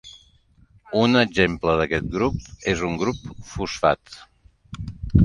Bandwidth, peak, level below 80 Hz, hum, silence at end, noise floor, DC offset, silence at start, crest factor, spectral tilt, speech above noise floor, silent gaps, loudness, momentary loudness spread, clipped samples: 11 kHz; -2 dBFS; -36 dBFS; none; 0 s; -56 dBFS; under 0.1%; 0.05 s; 20 dB; -6 dB/octave; 34 dB; none; -22 LUFS; 18 LU; under 0.1%